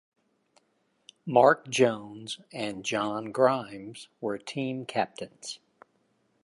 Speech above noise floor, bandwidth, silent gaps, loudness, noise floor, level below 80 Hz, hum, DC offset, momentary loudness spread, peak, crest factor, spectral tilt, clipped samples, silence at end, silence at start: 44 dB; 11.5 kHz; none; -28 LUFS; -72 dBFS; -74 dBFS; none; under 0.1%; 19 LU; -6 dBFS; 24 dB; -4.5 dB/octave; under 0.1%; 0.9 s; 1.25 s